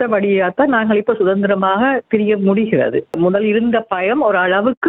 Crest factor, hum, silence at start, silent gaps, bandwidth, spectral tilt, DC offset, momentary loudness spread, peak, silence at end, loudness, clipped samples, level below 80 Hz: 12 dB; none; 0 s; 4.77-4.81 s; 4 kHz; -9 dB/octave; under 0.1%; 3 LU; -2 dBFS; 0 s; -15 LUFS; under 0.1%; -56 dBFS